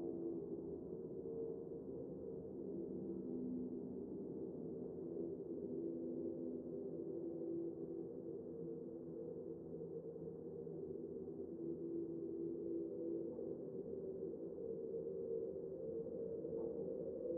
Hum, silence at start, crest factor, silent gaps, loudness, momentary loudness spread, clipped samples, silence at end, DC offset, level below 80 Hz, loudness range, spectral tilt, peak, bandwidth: none; 0 s; 14 dB; none; -47 LUFS; 4 LU; under 0.1%; 0 s; under 0.1%; -76 dBFS; 3 LU; -7 dB/octave; -34 dBFS; 1.8 kHz